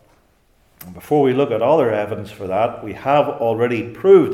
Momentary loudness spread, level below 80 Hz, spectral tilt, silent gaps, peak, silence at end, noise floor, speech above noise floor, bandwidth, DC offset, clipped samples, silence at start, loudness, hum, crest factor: 12 LU; -58 dBFS; -7.5 dB/octave; none; -2 dBFS; 0 s; -57 dBFS; 41 dB; 14.5 kHz; under 0.1%; under 0.1%; 0.8 s; -18 LUFS; none; 16 dB